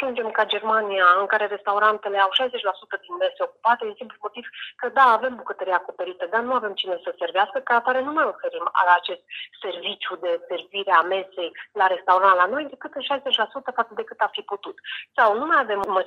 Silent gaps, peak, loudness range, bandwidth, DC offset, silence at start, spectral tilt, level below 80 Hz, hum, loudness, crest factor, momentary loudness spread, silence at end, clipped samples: none; -4 dBFS; 3 LU; 10.5 kHz; under 0.1%; 0 s; -3.5 dB/octave; -72 dBFS; none; -22 LUFS; 20 dB; 15 LU; 0 s; under 0.1%